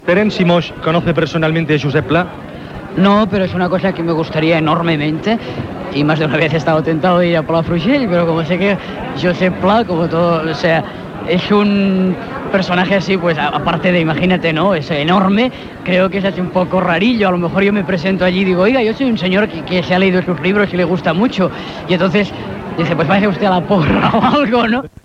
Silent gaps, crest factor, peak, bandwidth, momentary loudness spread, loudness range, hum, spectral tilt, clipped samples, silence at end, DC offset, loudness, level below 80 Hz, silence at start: none; 14 dB; 0 dBFS; 7.6 kHz; 6 LU; 1 LU; none; -7.5 dB/octave; under 0.1%; 0.15 s; under 0.1%; -14 LUFS; -42 dBFS; 0 s